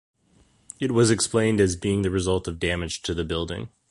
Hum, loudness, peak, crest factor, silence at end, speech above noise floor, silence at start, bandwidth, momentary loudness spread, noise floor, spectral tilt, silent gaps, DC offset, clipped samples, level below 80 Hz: none; -24 LUFS; -6 dBFS; 18 dB; 0.25 s; 37 dB; 0.8 s; 11.5 kHz; 10 LU; -61 dBFS; -5 dB/octave; none; under 0.1%; under 0.1%; -42 dBFS